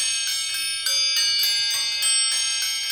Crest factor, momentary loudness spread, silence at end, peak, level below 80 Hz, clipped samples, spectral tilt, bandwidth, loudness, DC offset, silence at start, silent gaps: 14 dB; 5 LU; 0 s; -10 dBFS; -70 dBFS; under 0.1%; 4.5 dB/octave; over 20 kHz; -19 LUFS; under 0.1%; 0 s; none